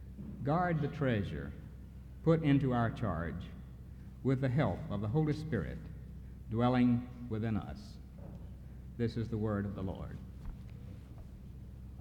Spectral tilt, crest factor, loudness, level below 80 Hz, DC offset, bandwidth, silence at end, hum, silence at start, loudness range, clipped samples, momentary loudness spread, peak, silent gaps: -9 dB/octave; 20 dB; -34 LUFS; -50 dBFS; under 0.1%; 9.2 kHz; 0 s; none; 0 s; 7 LU; under 0.1%; 20 LU; -16 dBFS; none